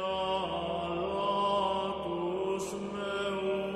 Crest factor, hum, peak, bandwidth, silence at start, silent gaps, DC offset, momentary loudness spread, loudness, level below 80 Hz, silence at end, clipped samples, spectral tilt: 14 dB; none; -18 dBFS; 13 kHz; 0 s; none; under 0.1%; 6 LU; -32 LUFS; -58 dBFS; 0 s; under 0.1%; -5 dB/octave